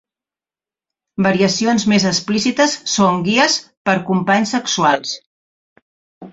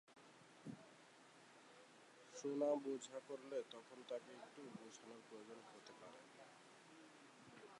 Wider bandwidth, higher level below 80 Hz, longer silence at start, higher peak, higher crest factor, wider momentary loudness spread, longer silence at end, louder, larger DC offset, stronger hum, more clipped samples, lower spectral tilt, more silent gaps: second, 8 kHz vs 11.5 kHz; first, -56 dBFS vs under -90 dBFS; first, 1.2 s vs 0.05 s; first, -2 dBFS vs -30 dBFS; second, 16 dB vs 22 dB; second, 5 LU vs 21 LU; about the same, 0.05 s vs 0 s; first, -16 LUFS vs -51 LUFS; neither; neither; neither; about the same, -4 dB/octave vs -4.5 dB/octave; first, 3.77-3.85 s, 5.26-5.76 s, 5.82-6.21 s vs none